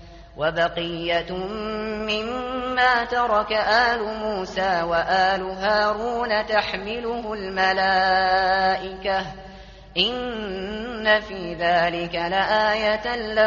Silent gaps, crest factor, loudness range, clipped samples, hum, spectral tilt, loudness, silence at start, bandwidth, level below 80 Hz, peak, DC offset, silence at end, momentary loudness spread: none; 18 dB; 3 LU; under 0.1%; none; -1 dB/octave; -22 LUFS; 0 s; 7.2 kHz; -46 dBFS; -6 dBFS; under 0.1%; 0 s; 10 LU